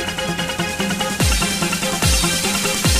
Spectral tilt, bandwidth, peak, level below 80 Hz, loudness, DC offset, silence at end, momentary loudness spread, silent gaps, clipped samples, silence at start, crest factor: -3 dB/octave; 16 kHz; -4 dBFS; -28 dBFS; -18 LUFS; under 0.1%; 0 s; 6 LU; none; under 0.1%; 0 s; 14 dB